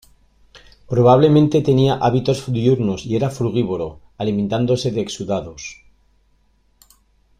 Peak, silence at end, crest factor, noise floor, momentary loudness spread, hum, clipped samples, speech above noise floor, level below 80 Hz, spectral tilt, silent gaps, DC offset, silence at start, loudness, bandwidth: -2 dBFS; 1.65 s; 18 dB; -59 dBFS; 13 LU; none; under 0.1%; 42 dB; -48 dBFS; -7 dB/octave; none; under 0.1%; 0.9 s; -18 LUFS; 11.5 kHz